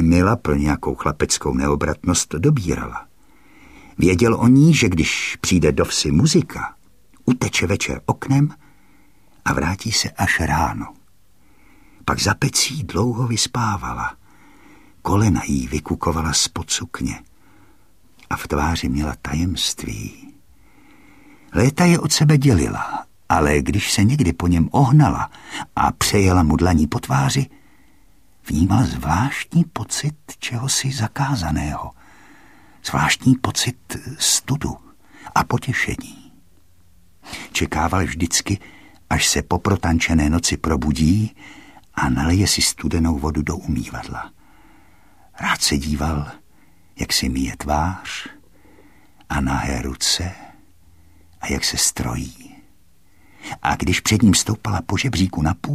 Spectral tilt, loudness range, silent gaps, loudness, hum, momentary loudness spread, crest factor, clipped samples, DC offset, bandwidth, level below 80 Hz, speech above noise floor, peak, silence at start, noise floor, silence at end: -4.5 dB/octave; 7 LU; none; -19 LUFS; none; 13 LU; 18 dB; under 0.1%; 0.3%; 15.5 kHz; -34 dBFS; 39 dB; -2 dBFS; 0 s; -58 dBFS; 0 s